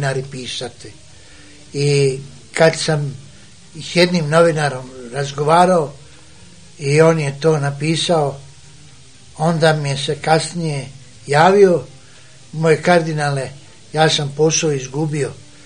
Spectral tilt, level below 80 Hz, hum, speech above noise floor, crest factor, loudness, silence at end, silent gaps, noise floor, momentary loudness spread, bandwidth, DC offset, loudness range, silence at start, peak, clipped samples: -5 dB/octave; -54 dBFS; none; 28 dB; 18 dB; -16 LUFS; 0.3 s; none; -44 dBFS; 15 LU; 10 kHz; 0.6%; 3 LU; 0 s; 0 dBFS; under 0.1%